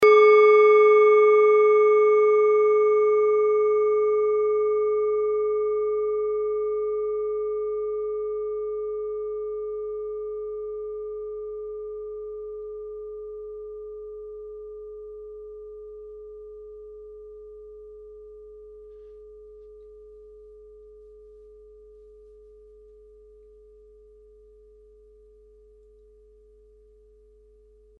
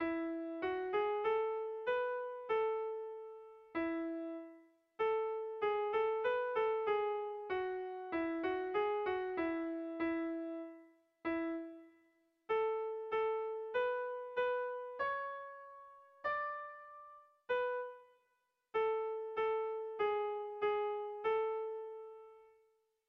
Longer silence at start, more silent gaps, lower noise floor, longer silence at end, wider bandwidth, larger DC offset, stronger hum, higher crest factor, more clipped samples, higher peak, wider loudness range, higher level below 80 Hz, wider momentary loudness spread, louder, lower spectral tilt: about the same, 0 s vs 0 s; neither; second, -55 dBFS vs -81 dBFS; first, 8.2 s vs 0.65 s; about the same, 5 kHz vs 5.2 kHz; neither; neither; about the same, 18 dB vs 14 dB; neither; first, -6 dBFS vs -24 dBFS; first, 26 LU vs 4 LU; first, -58 dBFS vs -76 dBFS; first, 26 LU vs 15 LU; first, -21 LUFS vs -38 LUFS; first, -5 dB/octave vs -2 dB/octave